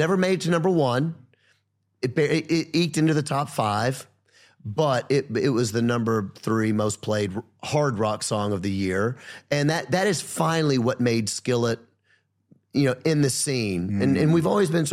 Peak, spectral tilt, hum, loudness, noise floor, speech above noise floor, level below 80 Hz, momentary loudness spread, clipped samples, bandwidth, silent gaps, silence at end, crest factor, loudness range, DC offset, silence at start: -6 dBFS; -5.5 dB/octave; none; -24 LUFS; -69 dBFS; 46 dB; -62 dBFS; 6 LU; under 0.1%; 15.5 kHz; none; 0 s; 18 dB; 1 LU; under 0.1%; 0 s